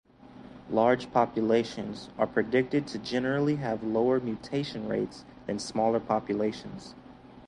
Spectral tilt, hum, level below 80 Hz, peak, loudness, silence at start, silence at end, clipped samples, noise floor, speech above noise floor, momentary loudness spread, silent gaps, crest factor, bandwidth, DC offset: -6 dB/octave; none; -60 dBFS; -8 dBFS; -29 LUFS; 0.25 s; 0 s; under 0.1%; -50 dBFS; 21 dB; 14 LU; none; 20 dB; 11.5 kHz; under 0.1%